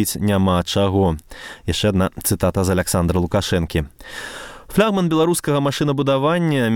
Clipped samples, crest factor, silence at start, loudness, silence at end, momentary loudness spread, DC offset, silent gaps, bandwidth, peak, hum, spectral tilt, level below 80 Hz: under 0.1%; 18 dB; 0 s; -19 LUFS; 0 s; 13 LU; under 0.1%; none; 18 kHz; -2 dBFS; none; -5.5 dB/octave; -38 dBFS